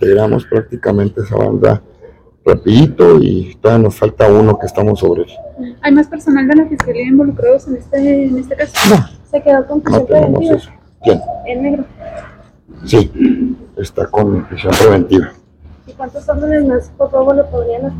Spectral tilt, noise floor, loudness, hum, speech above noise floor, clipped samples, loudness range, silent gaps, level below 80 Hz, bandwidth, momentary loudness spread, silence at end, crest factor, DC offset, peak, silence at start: -7 dB/octave; -40 dBFS; -12 LUFS; none; 29 dB; 1%; 5 LU; none; -34 dBFS; 16.5 kHz; 11 LU; 0 s; 12 dB; under 0.1%; 0 dBFS; 0 s